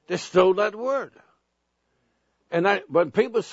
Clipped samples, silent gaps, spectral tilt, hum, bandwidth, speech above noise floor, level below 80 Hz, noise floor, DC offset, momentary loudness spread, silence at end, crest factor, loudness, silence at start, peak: under 0.1%; none; -5.5 dB/octave; none; 8 kHz; 52 dB; -68 dBFS; -75 dBFS; under 0.1%; 9 LU; 0 s; 20 dB; -23 LUFS; 0.1 s; -6 dBFS